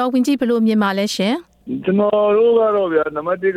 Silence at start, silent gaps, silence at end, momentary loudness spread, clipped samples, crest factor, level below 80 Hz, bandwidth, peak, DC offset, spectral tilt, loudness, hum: 0 s; none; 0 s; 7 LU; under 0.1%; 12 dB; -58 dBFS; 15 kHz; -4 dBFS; under 0.1%; -5.5 dB/octave; -17 LUFS; none